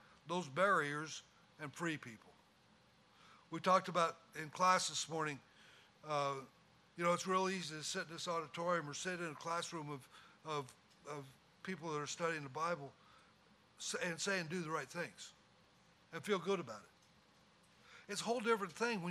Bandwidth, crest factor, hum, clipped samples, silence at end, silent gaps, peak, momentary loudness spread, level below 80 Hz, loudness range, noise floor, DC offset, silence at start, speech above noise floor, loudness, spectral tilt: 15 kHz; 24 dB; none; under 0.1%; 0 s; none; -18 dBFS; 18 LU; -84 dBFS; 7 LU; -70 dBFS; under 0.1%; 0.25 s; 29 dB; -40 LUFS; -3.5 dB/octave